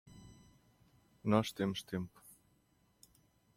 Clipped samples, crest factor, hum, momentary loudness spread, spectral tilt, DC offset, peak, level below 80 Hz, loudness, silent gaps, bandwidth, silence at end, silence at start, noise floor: under 0.1%; 24 dB; none; 26 LU; -6 dB/octave; under 0.1%; -16 dBFS; -70 dBFS; -37 LUFS; none; 16 kHz; 1.5 s; 0.05 s; -73 dBFS